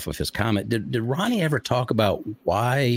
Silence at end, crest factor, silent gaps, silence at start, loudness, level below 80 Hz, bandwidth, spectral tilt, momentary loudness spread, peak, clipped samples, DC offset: 0 s; 18 dB; none; 0 s; -24 LUFS; -48 dBFS; 16.5 kHz; -6 dB/octave; 4 LU; -6 dBFS; under 0.1%; under 0.1%